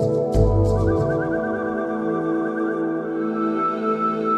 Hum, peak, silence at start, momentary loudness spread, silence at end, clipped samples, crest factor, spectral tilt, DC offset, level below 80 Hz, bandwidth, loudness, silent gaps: none; -6 dBFS; 0 s; 5 LU; 0 s; under 0.1%; 16 dB; -9 dB/octave; under 0.1%; -32 dBFS; 9.6 kHz; -22 LUFS; none